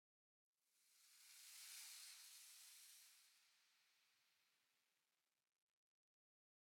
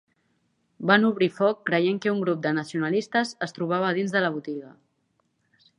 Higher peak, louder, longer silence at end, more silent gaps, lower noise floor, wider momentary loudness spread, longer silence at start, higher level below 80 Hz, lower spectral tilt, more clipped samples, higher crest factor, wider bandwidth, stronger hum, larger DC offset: second, -46 dBFS vs -4 dBFS; second, -60 LUFS vs -24 LUFS; first, 1.6 s vs 1.1 s; neither; first, under -90 dBFS vs -72 dBFS; about the same, 10 LU vs 11 LU; second, 0.65 s vs 0.8 s; second, under -90 dBFS vs -74 dBFS; second, 5 dB/octave vs -6 dB/octave; neither; about the same, 22 dB vs 22 dB; first, 18 kHz vs 11 kHz; neither; neither